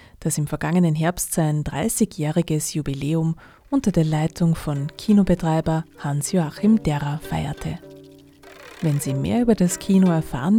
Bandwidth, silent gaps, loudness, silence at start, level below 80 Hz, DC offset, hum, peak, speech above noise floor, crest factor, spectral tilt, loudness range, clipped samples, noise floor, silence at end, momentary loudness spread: 16.5 kHz; none; -22 LUFS; 0.2 s; -42 dBFS; under 0.1%; none; -4 dBFS; 25 dB; 16 dB; -6 dB/octave; 3 LU; under 0.1%; -46 dBFS; 0 s; 8 LU